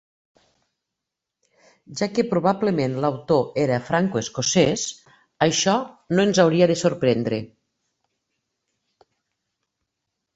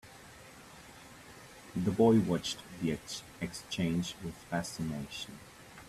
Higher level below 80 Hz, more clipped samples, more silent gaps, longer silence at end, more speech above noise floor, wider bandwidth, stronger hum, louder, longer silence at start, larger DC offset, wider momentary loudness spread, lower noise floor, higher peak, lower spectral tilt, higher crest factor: about the same, -60 dBFS vs -60 dBFS; neither; neither; first, 2.9 s vs 0 s; first, 64 dB vs 20 dB; second, 8.2 kHz vs 14.5 kHz; neither; first, -21 LUFS vs -34 LUFS; first, 1.9 s vs 0.05 s; neither; second, 9 LU vs 24 LU; first, -84 dBFS vs -53 dBFS; first, -2 dBFS vs -14 dBFS; about the same, -4.5 dB/octave vs -5.5 dB/octave; about the same, 20 dB vs 22 dB